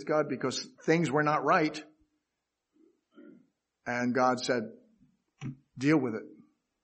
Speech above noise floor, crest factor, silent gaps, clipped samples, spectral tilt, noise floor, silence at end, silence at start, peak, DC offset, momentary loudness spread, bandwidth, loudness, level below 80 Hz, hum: 57 dB; 20 dB; none; under 0.1%; -5.5 dB/octave; -85 dBFS; 0.55 s; 0 s; -12 dBFS; under 0.1%; 18 LU; 8.4 kHz; -29 LUFS; -76 dBFS; none